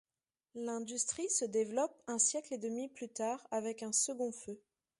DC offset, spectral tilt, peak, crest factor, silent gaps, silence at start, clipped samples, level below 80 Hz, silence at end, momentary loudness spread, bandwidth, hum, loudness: under 0.1%; -2 dB/octave; -18 dBFS; 20 dB; none; 0.55 s; under 0.1%; -82 dBFS; 0.4 s; 12 LU; 11.5 kHz; none; -36 LUFS